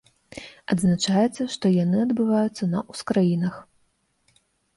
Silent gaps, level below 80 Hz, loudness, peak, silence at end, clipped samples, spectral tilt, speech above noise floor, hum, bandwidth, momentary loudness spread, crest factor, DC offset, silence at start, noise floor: none; -60 dBFS; -23 LUFS; -10 dBFS; 1.15 s; under 0.1%; -6.5 dB/octave; 46 dB; none; 11.5 kHz; 19 LU; 14 dB; under 0.1%; 0.35 s; -68 dBFS